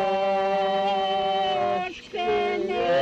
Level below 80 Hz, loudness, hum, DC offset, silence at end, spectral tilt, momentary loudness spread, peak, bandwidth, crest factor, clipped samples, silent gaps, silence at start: -58 dBFS; -25 LUFS; none; under 0.1%; 0 s; -5 dB/octave; 4 LU; -14 dBFS; 8.2 kHz; 10 dB; under 0.1%; none; 0 s